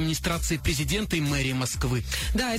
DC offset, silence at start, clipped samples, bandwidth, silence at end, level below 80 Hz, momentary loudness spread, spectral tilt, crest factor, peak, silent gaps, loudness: under 0.1%; 0 s; under 0.1%; 16 kHz; 0 s; -34 dBFS; 2 LU; -4 dB/octave; 12 dB; -14 dBFS; none; -27 LUFS